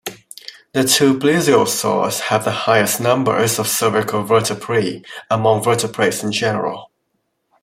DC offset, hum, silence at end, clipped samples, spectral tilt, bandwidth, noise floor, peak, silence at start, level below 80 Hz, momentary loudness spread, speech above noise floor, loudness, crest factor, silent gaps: under 0.1%; none; 0.8 s; under 0.1%; -4 dB/octave; 16.5 kHz; -70 dBFS; 0 dBFS; 0.05 s; -58 dBFS; 11 LU; 53 dB; -16 LUFS; 16 dB; none